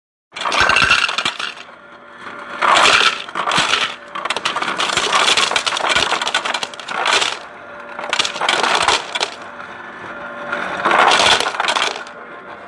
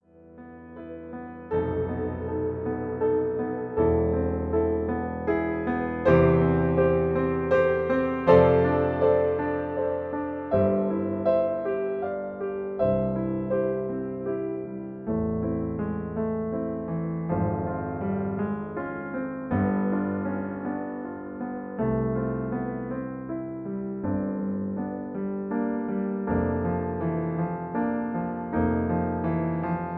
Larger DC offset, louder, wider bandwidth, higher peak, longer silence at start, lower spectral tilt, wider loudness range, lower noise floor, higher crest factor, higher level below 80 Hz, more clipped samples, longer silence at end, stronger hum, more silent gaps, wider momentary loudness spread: neither; first, -15 LUFS vs -27 LUFS; first, 11.5 kHz vs 5 kHz; first, 0 dBFS vs -4 dBFS; first, 0.35 s vs 0.2 s; second, -0.5 dB/octave vs -11 dB/octave; second, 3 LU vs 8 LU; second, -39 dBFS vs -48 dBFS; about the same, 18 dB vs 22 dB; about the same, -50 dBFS vs -46 dBFS; neither; about the same, 0 s vs 0 s; neither; neither; first, 20 LU vs 10 LU